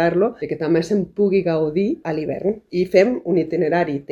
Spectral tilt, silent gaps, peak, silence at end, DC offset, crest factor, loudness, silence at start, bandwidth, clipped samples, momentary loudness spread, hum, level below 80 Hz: -7.5 dB/octave; none; 0 dBFS; 0.1 s; under 0.1%; 18 dB; -20 LUFS; 0 s; 10.5 kHz; under 0.1%; 7 LU; none; -54 dBFS